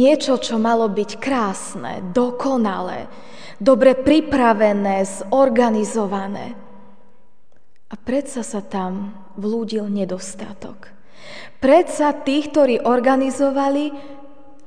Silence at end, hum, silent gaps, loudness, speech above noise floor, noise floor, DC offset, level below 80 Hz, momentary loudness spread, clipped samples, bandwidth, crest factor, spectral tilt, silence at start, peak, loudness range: 0.4 s; none; none; -19 LUFS; 44 dB; -62 dBFS; 2%; -52 dBFS; 19 LU; under 0.1%; 10 kHz; 18 dB; -5 dB/octave; 0 s; 0 dBFS; 10 LU